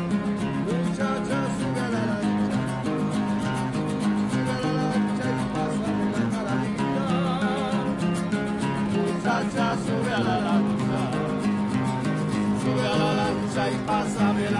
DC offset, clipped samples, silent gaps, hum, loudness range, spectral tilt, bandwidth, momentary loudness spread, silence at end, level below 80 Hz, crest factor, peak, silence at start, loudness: under 0.1%; under 0.1%; none; none; 1 LU; -6.5 dB/octave; 11.5 kHz; 3 LU; 0 s; -50 dBFS; 14 dB; -12 dBFS; 0 s; -25 LUFS